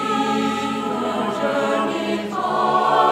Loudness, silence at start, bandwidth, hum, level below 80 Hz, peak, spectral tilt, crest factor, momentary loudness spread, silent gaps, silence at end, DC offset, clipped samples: -21 LUFS; 0 s; 16 kHz; none; -70 dBFS; -4 dBFS; -4.5 dB/octave; 16 dB; 6 LU; none; 0 s; under 0.1%; under 0.1%